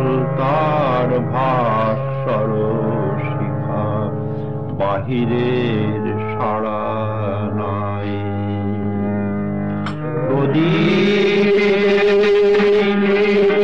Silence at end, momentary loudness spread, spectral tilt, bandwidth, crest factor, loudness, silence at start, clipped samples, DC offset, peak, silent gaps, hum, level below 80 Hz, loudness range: 0 s; 8 LU; -8 dB/octave; 7.4 kHz; 10 dB; -18 LUFS; 0 s; under 0.1%; 2%; -6 dBFS; none; none; -46 dBFS; 7 LU